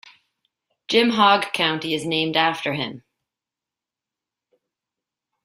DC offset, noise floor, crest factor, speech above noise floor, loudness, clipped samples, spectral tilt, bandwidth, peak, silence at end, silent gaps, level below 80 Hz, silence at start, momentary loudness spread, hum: under 0.1%; -88 dBFS; 22 dB; 68 dB; -20 LUFS; under 0.1%; -4 dB/octave; 16 kHz; -2 dBFS; 2.45 s; none; -68 dBFS; 0.9 s; 10 LU; none